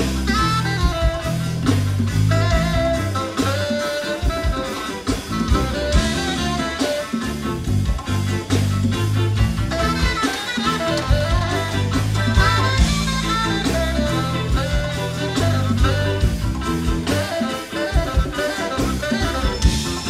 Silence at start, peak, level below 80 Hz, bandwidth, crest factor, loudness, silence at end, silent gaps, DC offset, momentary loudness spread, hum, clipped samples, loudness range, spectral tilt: 0 s; -2 dBFS; -26 dBFS; 15.5 kHz; 18 dB; -20 LUFS; 0 s; none; under 0.1%; 5 LU; none; under 0.1%; 3 LU; -5 dB/octave